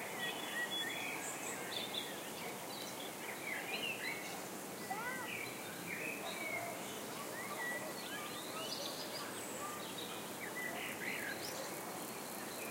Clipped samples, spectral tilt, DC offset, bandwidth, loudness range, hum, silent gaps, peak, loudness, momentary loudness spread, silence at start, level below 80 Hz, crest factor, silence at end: under 0.1%; -2 dB/octave; under 0.1%; 16 kHz; 1 LU; none; none; -28 dBFS; -42 LUFS; 5 LU; 0 s; -82 dBFS; 16 dB; 0 s